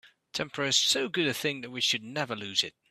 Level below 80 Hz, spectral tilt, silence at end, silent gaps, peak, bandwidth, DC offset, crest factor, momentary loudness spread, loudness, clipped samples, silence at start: -74 dBFS; -2 dB/octave; 0.2 s; none; -10 dBFS; 15.5 kHz; under 0.1%; 22 dB; 10 LU; -28 LUFS; under 0.1%; 0.05 s